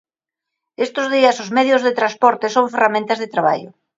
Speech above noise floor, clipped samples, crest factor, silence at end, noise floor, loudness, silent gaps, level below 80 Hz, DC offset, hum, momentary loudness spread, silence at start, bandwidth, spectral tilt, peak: 67 dB; under 0.1%; 18 dB; 0.3 s; -84 dBFS; -17 LUFS; none; -72 dBFS; under 0.1%; none; 6 LU; 0.8 s; 7.8 kHz; -4 dB/octave; 0 dBFS